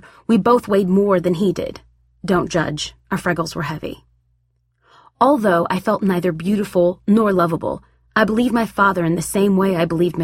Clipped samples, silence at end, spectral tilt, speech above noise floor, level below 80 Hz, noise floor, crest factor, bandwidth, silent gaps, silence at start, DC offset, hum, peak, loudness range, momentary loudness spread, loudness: under 0.1%; 0 s; -6 dB/octave; 47 dB; -48 dBFS; -65 dBFS; 16 dB; 16 kHz; none; 0.3 s; under 0.1%; none; -2 dBFS; 6 LU; 10 LU; -18 LUFS